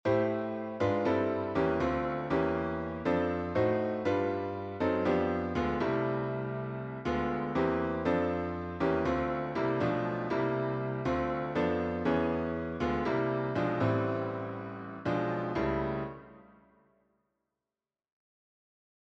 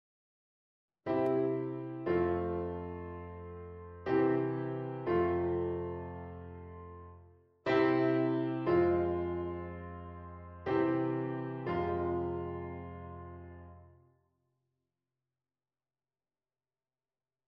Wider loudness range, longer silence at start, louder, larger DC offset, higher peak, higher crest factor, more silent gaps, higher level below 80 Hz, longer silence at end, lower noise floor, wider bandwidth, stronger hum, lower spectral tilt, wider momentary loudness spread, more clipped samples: about the same, 5 LU vs 7 LU; second, 0.05 s vs 1.05 s; about the same, -32 LUFS vs -34 LUFS; neither; about the same, -16 dBFS vs -16 dBFS; about the same, 16 dB vs 20 dB; neither; first, -52 dBFS vs -60 dBFS; second, 2.65 s vs 3.6 s; about the same, under -90 dBFS vs under -90 dBFS; first, 7.8 kHz vs 5.8 kHz; neither; second, -8 dB/octave vs -9.5 dB/octave; second, 6 LU vs 19 LU; neither